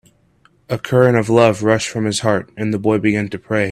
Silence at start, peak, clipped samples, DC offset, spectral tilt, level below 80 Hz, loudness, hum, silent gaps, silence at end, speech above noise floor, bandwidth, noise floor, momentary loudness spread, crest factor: 0.7 s; 0 dBFS; under 0.1%; under 0.1%; -5.5 dB/octave; -52 dBFS; -16 LUFS; none; none; 0 s; 40 dB; 14 kHz; -55 dBFS; 8 LU; 16 dB